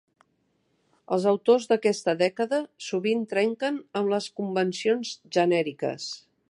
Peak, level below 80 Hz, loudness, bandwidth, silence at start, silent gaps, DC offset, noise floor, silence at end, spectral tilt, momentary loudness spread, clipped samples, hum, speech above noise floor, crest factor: -8 dBFS; -80 dBFS; -26 LUFS; 11.5 kHz; 1.1 s; none; under 0.1%; -71 dBFS; 0.3 s; -5 dB/octave; 9 LU; under 0.1%; none; 46 dB; 18 dB